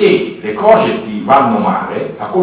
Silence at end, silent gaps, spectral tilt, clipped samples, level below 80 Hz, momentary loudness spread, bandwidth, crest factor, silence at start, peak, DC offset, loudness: 0 s; none; -10 dB/octave; 0.1%; -50 dBFS; 11 LU; 4 kHz; 12 dB; 0 s; 0 dBFS; under 0.1%; -13 LUFS